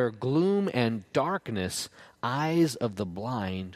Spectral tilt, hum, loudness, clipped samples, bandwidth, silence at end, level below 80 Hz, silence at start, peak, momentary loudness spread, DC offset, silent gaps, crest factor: -5.5 dB/octave; none; -29 LUFS; under 0.1%; 15.5 kHz; 0 s; -64 dBFS; 0 s; -10 dBFS; 8 LU; under 0.1%; none; 18 dB